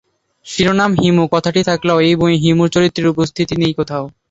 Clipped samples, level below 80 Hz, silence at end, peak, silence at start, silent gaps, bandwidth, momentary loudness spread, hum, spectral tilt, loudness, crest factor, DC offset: under 0.1%; -44 dBFS; 0.2 s; 0 dBFS; 0.45 s; none; 8 kHz; 6 LU; none; -6 dB/octave; -14 LUFS; 14 dB; under 0.1%